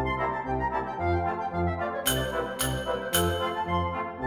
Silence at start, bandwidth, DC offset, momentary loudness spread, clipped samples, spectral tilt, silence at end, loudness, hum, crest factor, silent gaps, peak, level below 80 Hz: 0 s; 19.5 kHz; under 0.1%; 4 LU; under 0.1%; -4 dB/octave; 0 s; -28 LUFS; none; 18 dB; none; -10 dBFS; -42 dBFS